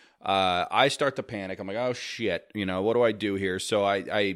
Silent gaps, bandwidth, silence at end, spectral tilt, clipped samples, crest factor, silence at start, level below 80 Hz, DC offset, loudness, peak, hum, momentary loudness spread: none; 15.5 kHz; 0 s; -4.5 dB/octave; under 0.1%; 22 dB; 0.25 s; -64 dBFS; under 0.1%; -27 LUFS; -4 dBFS; none; 8 LU